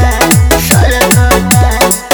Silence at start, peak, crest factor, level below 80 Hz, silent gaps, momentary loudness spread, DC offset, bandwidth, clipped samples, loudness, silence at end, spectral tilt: 0 s; 0 dBFS; 8 dB; -14 dBFS; none; 2 LU; under 0.1%; over 20 kHz; 1%; -8 LUFS; 0 s; -4 dB/octave